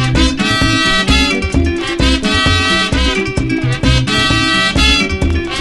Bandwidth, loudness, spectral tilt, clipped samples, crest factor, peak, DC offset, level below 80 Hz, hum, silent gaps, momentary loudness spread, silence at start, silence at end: 12 kHz; -12 LUFS; -4 dB/octave; under 0.1%; 12 dB; 0 dBFS; under 0.1%; -20 dBFS; none; none; 5 LU; 0 s; 0 s